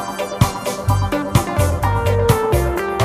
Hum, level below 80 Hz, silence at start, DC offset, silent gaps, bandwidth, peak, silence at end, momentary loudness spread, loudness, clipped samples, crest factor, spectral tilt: none; -28 dBFS; 0 s; under 0.1%; none; 15.5 kHz; -2 dBFS; 0 s; 4 LU; -18 LUFS; under 0.1%; 16 dB; -6 dB/octave